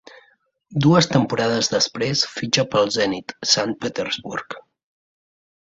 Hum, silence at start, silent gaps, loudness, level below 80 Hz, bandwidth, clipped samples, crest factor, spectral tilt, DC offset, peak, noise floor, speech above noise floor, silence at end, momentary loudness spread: none; 0.7 s; none; -20 LUFS; -58 dBFS; 8 kHz; under 0.1%; 20 dB; -4 dB/octave; under 0.1%; -2 dBFS; -60 dBFS; 40 dB; 1.15 s; 13 LU